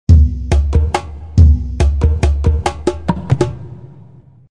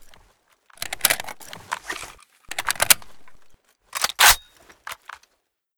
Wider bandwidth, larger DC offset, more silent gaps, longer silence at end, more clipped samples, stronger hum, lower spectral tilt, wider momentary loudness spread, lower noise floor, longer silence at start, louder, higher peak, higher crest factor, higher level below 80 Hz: second, 10 kHz vs over 20 kHz; neither; neither; about the same, 0.65 s vs 0.65 s; first, 0.4% vs under 0.1%; neither; first, -7.5 dB/octave vs 1.5 dB/octave; second, 10 LU vs 24 LU; second, -41 dBFS vs -72 dBFS; about the same, 0.1 s vs 0 s; first, -15 LUFS vs -19 LUFS; about the same, 0 dBFS vs 0 dBFS; second, 14 dB vs 26 dB; first, -16 dBFS vs -48 dBFS